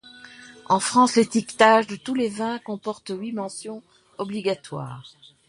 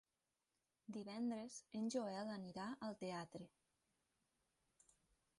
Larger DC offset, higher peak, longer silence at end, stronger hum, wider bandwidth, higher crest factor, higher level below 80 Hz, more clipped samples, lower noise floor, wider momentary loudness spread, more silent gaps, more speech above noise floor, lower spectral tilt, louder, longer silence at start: neither; first, -2 dBFS vs -32 dBFS; second, 0.4 s vs 1.9 s; neither; about the same, 11.5 kHz vs 11.5 kHz; about the same, 22 dB vs 20 dB; first, -68 dBFS vs -86 dBFS; neither; second, -45 dBFS vs under -90 dBFS; first, 22 LU vs 12 LU; neither; second, 23 dB vs over 42 dB; about the same, -4 dB/octave vs -5 dB/octave; first, -22 LUFS vs -48 LUFS; second, 0.05 s vs 0.9 s